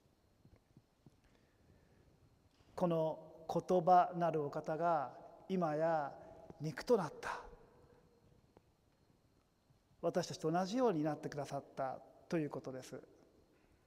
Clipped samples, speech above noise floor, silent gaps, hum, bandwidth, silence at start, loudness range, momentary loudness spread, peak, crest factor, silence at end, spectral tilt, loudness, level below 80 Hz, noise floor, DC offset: under 0.1%; 37 dB; none; none; 15 kHz; 2.75 s; 9 LU; 15 LU; -20 dBFS; 20 dB; 0.85 s; -6.5 dB/octave; -38 LUFS; -74 dBFS; -74 dBFS; under 0.1%